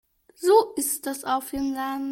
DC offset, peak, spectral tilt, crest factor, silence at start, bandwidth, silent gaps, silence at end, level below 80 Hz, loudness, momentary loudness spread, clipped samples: under 0.1%; -6 dBFS; -2.5 dB/octave; 18 dB; 0.4 s; 17 kHz; none; 0 s; -58 dBFS; -24 LUFS; 9 LU; under 0.1%